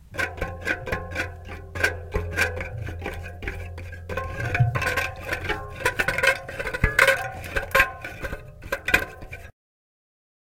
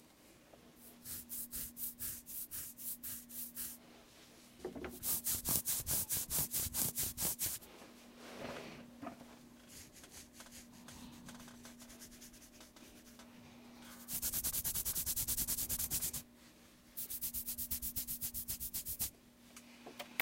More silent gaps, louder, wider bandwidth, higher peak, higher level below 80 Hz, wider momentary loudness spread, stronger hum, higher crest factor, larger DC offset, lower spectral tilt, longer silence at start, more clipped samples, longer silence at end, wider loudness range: neither; first, -25 LUFS vs -38 LUFS; about the same, 17 kHz vs 16.5 kHz; first, 0 dBFS vs -12 dBFS; first, -38 dBFS vs -60 dBFS; second, 15 LU vs 22 LU; neither; about the same, 26 dB vs 30 dB; neither; first, -4 dB/octave vs -1.5 dB/octave; about the same, 0 s vs 0 s; neither; first, 0.9 s vs 0 s; second, 6 LU vs 18 LU